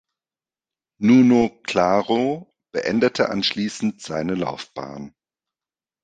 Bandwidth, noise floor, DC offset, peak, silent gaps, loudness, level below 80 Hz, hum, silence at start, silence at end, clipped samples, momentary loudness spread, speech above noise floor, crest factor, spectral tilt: 9 kHz; under -90 dBFS; under 0.1%; -4 dBFS; none; -20 LUFS; -58 dBFS; none; 1 s; 0.95 s; under 0.1%; 18 LU; over 70 dB; 18 dB; -5.5 dB/octave